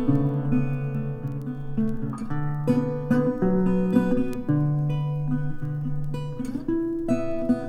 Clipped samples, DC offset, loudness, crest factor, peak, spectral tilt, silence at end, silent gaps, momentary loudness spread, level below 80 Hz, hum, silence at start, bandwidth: under 0.1%; under 0.1%; -26 LUFS; 16 dB; -8 dBFS; -9.5 dB/octave; 0 s; none; 9 LU; -40 dBFS; none; 0 s; 9.8 kHz